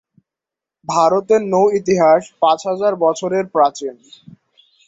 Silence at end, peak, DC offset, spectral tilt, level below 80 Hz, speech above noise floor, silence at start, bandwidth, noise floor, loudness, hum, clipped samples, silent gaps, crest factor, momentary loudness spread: 0.95 s; -2 dBFS; under 0.1%; -5 dB/octave; -62 dBFS; 71 dB; 0.9 s; 8 kHz; -86 dBFS; -16 LUFS; none; under 0.1%; none; 16 dB; 7 LU